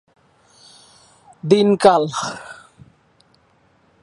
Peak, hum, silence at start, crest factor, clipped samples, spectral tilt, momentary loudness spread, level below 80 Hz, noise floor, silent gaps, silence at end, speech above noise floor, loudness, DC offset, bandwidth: 0 dBFS; none; 1.45 s; 22 dB; under 0.1%; -5.5 dB/octave; 21 LU; -62 dBFS; -58 dBFS; none; 1.5 s; 42 dB; -16 LUFS; under 0.1%; 11 kHz